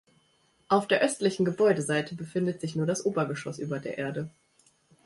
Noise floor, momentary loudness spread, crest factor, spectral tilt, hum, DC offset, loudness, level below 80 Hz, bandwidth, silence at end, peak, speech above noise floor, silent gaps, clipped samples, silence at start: -67 dBFS; 10 LU; 20 dB; -5.5 dB/octave; none; under 0.1%; -28 LUFS; -68 dBFS; 11.5 kHz; 0.75 s; -10 dBFS; 40 dB; none; under 0.1%; 0.7 s